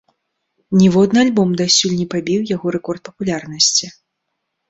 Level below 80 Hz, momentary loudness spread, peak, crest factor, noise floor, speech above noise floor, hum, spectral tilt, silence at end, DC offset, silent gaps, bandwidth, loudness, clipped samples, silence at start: -54 dBFS; 11 LU; 0 dBFS; 16 dB; -75 dBFS; 59 dB; none; -4 dB/octave; 0.8 s; under 0.1%; none; 8 kHz; -15 LUFS; under 0.1%; 0.7 s